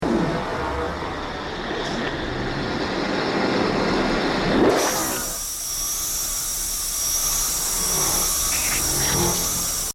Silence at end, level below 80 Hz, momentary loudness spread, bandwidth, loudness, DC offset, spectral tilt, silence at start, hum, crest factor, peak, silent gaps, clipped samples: 0 s; -38 dBFS; 8 LU; 19 kHz; -21 LUFS; under 0.1%; -2.5 dB/octave; 0 s; none; 16 dB; -6 dBFS; none; under 0.1%